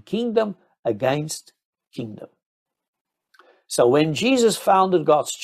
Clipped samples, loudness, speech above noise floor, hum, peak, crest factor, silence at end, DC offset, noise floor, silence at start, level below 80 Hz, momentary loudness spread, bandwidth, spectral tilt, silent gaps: under 0.1%; -20 LUFS; 37 dB; none; -4 dBFS; 18 dB; 0 s; under 0.1%; -57 dBFS; 0.1 s; -66 dBFS; 17 LU; 15 kHz; -4.5 dB/octave; 0.79-0.83 s, 1.65-1.73 s, 2.46-2.66 s, 2.88-2.93 s, 3.01-3.05 s